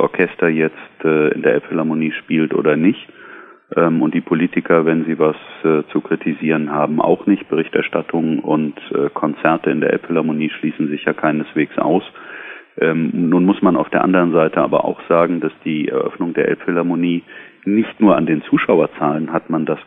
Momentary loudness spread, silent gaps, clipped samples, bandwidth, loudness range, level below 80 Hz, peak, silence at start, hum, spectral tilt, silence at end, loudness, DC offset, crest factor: 7 LU; none; under 0.1%; 3.9 kHz; 3 LU; -60 dBFS; 0 dBFS; 0 s; none; -10 dB/octave; 0.05 s; -17 LUFS; under 0.1%; 16 dB